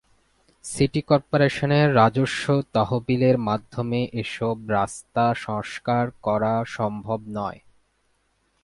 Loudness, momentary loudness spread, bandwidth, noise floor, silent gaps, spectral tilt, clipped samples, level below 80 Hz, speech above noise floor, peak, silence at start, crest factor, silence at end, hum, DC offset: -23 LUFS; 10 LU; 11.5 kHz; -68 dBFS; none; -6.5 dB/octave; under 0.1%; -54 dBFS; 46 dB; -2 dBFS; 0.65 s; 20 dB; 1.1 s; none; under 0.1%